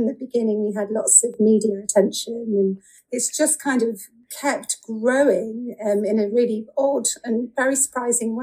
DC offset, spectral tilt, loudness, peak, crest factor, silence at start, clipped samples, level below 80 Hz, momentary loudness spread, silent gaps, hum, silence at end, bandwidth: under 0.1%; -3.5 dB/octave; -20 LUFS; 0 dBFS; 20 dB; 0 s; under 0.1%; -70 dBFS; 9 LU; none; none; 0 s; 15.5 kHz